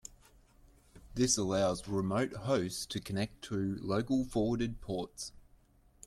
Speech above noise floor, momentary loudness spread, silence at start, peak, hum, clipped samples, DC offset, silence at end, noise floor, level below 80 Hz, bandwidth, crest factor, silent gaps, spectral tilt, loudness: 31 dB; 11 LU; 0.05 s; -14 dBFS; none; under 0.1%; under 0.1%; 0.65 s; -64 dBFS; -56 dBFS; 14.5 kHz; 20 dB; none; -4.5 dB/octave; -34 LUFS